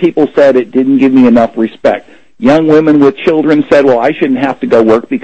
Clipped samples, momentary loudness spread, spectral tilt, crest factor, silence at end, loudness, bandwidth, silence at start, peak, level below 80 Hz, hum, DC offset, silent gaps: 1%; 7 LU; -7.5 dB/octave; 8 dB; 0.05 s; -8 LUFS; 8.2 kHz; 0 s; 0 dBFS; -46 dBFS; none; 0.9%; none